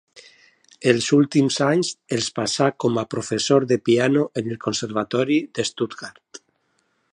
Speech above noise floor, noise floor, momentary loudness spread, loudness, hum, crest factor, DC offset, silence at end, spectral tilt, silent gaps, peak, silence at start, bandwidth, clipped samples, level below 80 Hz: 47 dB; -68 dBFS; 8 LU; -21 LUFS; none; 20 dB; under 0.1%; 0.75 s; -4.5 dB/octave; none; -2 dBFS; 0.15 s; 11 kHz; under 0.1%; -64 dBFS